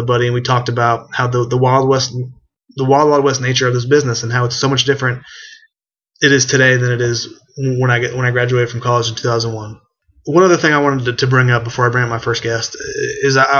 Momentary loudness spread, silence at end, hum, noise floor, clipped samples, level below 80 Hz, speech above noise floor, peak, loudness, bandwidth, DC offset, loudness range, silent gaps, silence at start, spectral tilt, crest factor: 11 LU; 0 s; none; -72 dBFS; under 0.1%; -50 dBFS; 58 dB; 0 dBFS; -14 LUFS; 7.2 kHz; under 0.1%; 2 LU; none; 0 s; -4.5 dB/octave; 14 dB